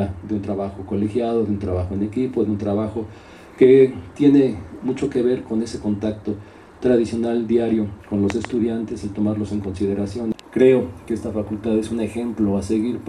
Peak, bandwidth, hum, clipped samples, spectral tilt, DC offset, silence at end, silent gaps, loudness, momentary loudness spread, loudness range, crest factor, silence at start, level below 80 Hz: -2 dBFS; 11 kHz; none; under 0.1%; -8 dB/octave; under 0.1%; 0 s; none; -21 LUFS; 11 LU; 4 LU; 18 dB; 0 s; -46 dBFS